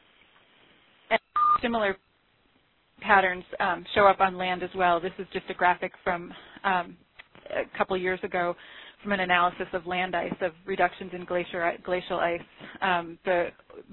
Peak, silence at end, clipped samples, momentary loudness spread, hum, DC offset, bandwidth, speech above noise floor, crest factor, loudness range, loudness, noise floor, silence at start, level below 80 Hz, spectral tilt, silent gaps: -6 dBFS; 0.1 s; under 0.1%; 13 LU; none; under 0.1%; 4.3 kHz; 39 dB; 22 dB; 5 LU; -27 LUFS; -66 dBFS; 1.1 s; -58 dBFS; -8.5 dB/octave; none